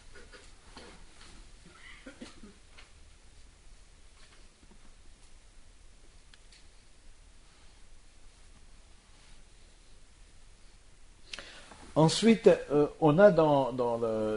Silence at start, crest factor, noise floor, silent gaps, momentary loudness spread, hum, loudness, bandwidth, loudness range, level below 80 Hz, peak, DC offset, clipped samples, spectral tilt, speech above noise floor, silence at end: 0.15 s; 24 dB; -55 dBFS; none; 30 LU; none; -25 LUFS; 10.5 kHz; 28 LU; -56 dBFS; -8 dBFS; under 0.1%; under 0.1%; -6 dB/octave; 31 dB; 0 s